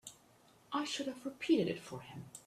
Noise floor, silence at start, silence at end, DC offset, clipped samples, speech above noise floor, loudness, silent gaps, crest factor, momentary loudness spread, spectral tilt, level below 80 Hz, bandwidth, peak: -66 dBFS; 0.05 s; 0.05 s; under 0.1%; under 0.1%; 28 dB; -37 LUFS; none; 20 dB; 16 LU; -4.5 dB/octave; -76 dBFS; 14 kHz; -20 dBFS